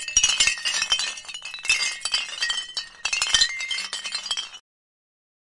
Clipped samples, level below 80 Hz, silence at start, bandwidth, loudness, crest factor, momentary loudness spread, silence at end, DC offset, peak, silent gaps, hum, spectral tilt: under 0.1%; -52 dBFS; 0 s; 11.5 kHz; -22 LUFS; 24 dB; 10 LU; 0.85 s; under 0.1%; -2 dBFS; none; none; 3 dB/octave